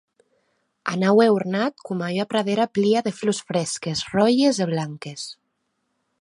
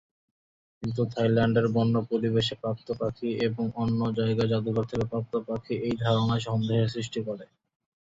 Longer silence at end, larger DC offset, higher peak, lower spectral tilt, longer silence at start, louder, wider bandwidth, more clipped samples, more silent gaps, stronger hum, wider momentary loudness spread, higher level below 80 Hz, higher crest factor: first, 0.9 s vs 0.65 s; neither; first, -4 dBFS vs -10 dBFS; second, -5 dB/octave vs -7.5 dB/octave; about the same, 0.85 s vs 0.8 s; first, -22 LUFS vs -28 LUFS; first, 11.5 kHz vs 7.8 kHz; neither; neither; neither; first, 14 LU vs 9 LU; second, -64 dBFS vs -56 dBFS; about the same, 18 dB vs 16 dB